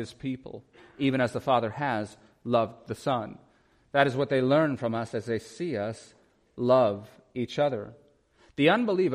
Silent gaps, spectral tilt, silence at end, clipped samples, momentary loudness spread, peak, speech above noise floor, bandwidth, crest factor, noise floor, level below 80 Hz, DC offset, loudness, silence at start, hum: none; -6.5 dB/octave; 0 s; under 0.1%; 17 LU; -8 dBFS; 35 dB; 12.5 kHz; 20 dB; -62 dBFS; -66 dBFS; under 0.1%; -27 LUFS; 0 s; none